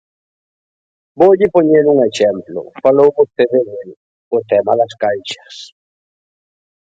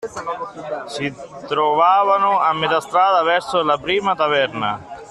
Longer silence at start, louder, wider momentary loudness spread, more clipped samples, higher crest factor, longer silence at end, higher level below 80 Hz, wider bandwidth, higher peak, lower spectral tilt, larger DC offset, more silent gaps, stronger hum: first, 1.15 s vs 0 s; first, -13 LUFS vs -18 LUFS; first, 16 LU vs 13 LU; neither; about the same, 14 dB vs 16 dB; first, 1.2 s vs 0 s; about the same, -58 dBFS vs -58 dBFS; second, 7.8 kHz vs 12.5 kHz; first, 0 dBFS vs -4 dBFS; first, -6 dB/octave vs -4 dB/octave; neither; first, 3.97-4.31 s vs none; neither